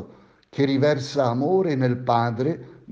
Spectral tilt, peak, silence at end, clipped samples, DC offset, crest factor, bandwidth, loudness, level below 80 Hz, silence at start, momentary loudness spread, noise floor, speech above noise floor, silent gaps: -7.5 dB/octave; -6 dBFS; 0 s; under 0.1%; under 0.1%; 16 dB; 7.8 kHz; -22 LUFS; -64 dBFS; 0 s; 6 LU; -50 dBFS; 29 dB; none